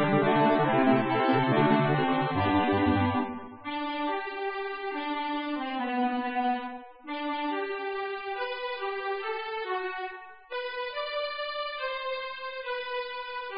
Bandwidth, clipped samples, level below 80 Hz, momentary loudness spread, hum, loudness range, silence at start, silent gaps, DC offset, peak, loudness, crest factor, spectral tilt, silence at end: 5.2 kHz; under 0.1%; -60 dBFS; 12 LU; none; 8 LU; 0 s; none; 0.2%; -10 dBFS; -29 LUFS; 18 dB; -10 dB/octave; 0 s